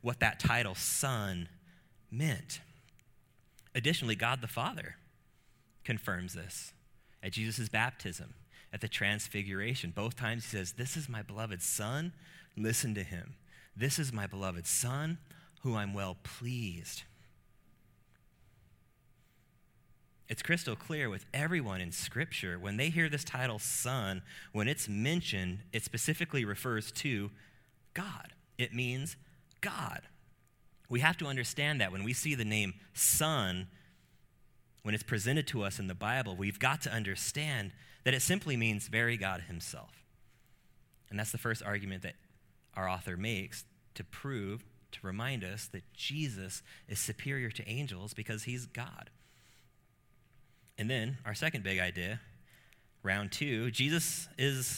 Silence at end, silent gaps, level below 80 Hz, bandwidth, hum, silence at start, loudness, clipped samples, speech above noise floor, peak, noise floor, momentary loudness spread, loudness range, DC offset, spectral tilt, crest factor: 0 s; none; -62 dBFS; 17 kHz; none; 0.05 s; -35 LUFS; under 0.1%; 32 dB; -10 dBFS; -68 dBFS; 14 LU; 8 LU; under 0.1%; -3.5 dB/octave; 28 dB